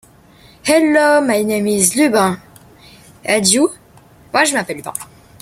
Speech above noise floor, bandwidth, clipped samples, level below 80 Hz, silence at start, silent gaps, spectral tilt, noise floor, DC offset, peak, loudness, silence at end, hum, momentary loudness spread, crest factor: 32 dB; 16 kHz; under 0.1%; -54 dBFS; 0.65 s; none; -3 dB/octave; -46 dBFS; under 0.1%; 0 dBFS; -14 LUFS; 0.35 s; none; 14 LU; 16 dB